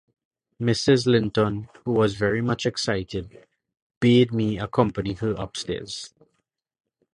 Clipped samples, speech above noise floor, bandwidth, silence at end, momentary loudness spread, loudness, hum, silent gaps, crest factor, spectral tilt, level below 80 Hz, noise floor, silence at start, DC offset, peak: under 0.1%; 53 dB; 11.5 kHz; 1.1 s; 13 LU; -23 LUFS; none; 3.82-3.90 s, 3.97-4.01 s; 20 dB; -6 dB/octave; -50 dBFS; -76 dBFS; 0.6 s; under 0.1%; -4 dBFS